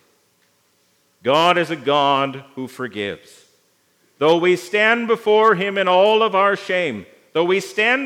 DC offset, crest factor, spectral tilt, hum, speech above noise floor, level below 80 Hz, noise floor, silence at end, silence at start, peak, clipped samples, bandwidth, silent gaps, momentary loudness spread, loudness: under 0.1%; 18 dB; -4.5 dB/octave; none; 44 dB; -74 dBFS; -62 dBFS; 0 s; 1.25 s; 0 dBFS; under 0.1%; 15.5 kHz; none; 13 LU; -17 LUFS